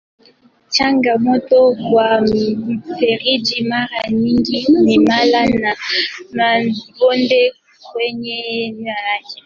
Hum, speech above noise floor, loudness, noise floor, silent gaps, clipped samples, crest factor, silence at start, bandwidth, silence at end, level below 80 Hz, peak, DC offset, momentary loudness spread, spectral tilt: none; 36 dB; -15 LUFS; -51 dBFS; none; under 0.1%; 14 dB; 0.7 s; 7.4 kHz; 0.1 s; -50 dBFS; -2 dBFS; under 0.1%; 10 LU; -5 dB/octave